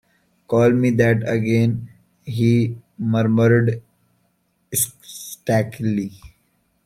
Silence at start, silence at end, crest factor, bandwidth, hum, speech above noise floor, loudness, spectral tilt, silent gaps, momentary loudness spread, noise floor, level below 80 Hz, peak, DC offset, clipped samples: 0.5 s; 0.6 s; 18 dB; 16 kHz; none; 48 dB; -19 LUFS; -6.5 dB/octave; none; 14 LU; -66 dBFS; -56 dBFS; -2 dBFS; under 0.1%; under 0.1%